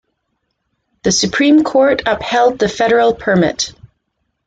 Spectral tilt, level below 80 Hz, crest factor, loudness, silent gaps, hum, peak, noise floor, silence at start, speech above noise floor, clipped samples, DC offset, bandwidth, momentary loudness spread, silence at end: -4 dB/octave; -46 dBFS; 14 dB; -13 LUFS; none; none; -2 dBFS; -70 dBFS; 1.05 s; 57 dB; under 0.1%; under 0.1%; 9.2 kHz; 6 LU; 0.75 s